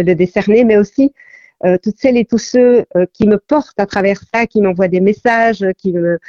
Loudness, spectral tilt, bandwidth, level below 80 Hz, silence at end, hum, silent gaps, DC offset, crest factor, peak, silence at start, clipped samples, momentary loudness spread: -13 LUFS; -7 dB/octave; 7.4 kHz; -48 dBFS; 0.1 s; none; none; under 0.1%; 12 dB; 0 dBFS; 0 s; under 0.1%; 6 LU